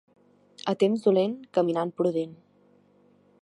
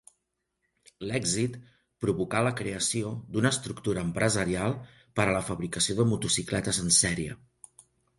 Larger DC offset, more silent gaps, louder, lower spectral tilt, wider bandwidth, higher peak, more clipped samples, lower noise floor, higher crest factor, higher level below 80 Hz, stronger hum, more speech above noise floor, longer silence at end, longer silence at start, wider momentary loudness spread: neither; neither; about the same, -26 LUFS vs -28 LUFS; first, -7.5 dB/octave vs -3.5 dB/octave; about the same, 11 kHz vs 11.5 kHz; about the same, -10 dBFS vs -8 dBFS; neither; second, -61 dBFS vs -80 dBFS; about the same, 18 dB vs 22 dB; second, -78 dBFS vs -52 dBFS; neither; second, 36 dB vs 52 dB; first, 1.1 s vs 0.85 s; second, 0.65 s vs 1 s; about the same, 10 LU vs 11 LU